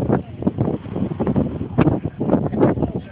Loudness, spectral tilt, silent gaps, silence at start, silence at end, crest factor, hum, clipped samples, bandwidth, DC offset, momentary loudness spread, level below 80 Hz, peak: -21 LUFS; -13.5 dB/octave; none; 0 s; 0 s; 18 dB; none; under 0.1%; 4.3 kHz; under 0.1%; 6 LU; -38 dBFS; -2 dBFS